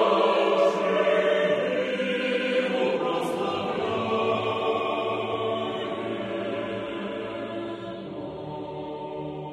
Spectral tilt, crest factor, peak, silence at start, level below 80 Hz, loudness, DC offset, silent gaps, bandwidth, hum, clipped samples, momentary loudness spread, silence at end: -5.5 dB/octave; 16 dB; -10 dBFS; 0 s; -64 dBFS; -27 LUFS; under 0.1%; none; 13 kHz; none; under 0.1%; 13 LU; 0 s